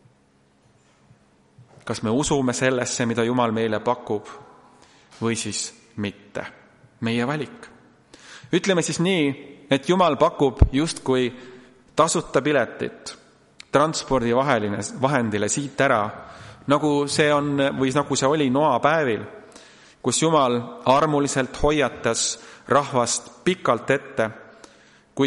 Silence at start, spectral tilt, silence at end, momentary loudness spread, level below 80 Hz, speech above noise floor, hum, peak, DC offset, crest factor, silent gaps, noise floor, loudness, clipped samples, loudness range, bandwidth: 1.85 s; -4.5 dB/octave; 0 s; 12 LU; -38 dBFS; 38 dB; none; -2 dBFS; under 0.1%; 22 dB; none; -60 dBFS; -22 LUFS; under 0.1%; 7 LU; 11.5 kHz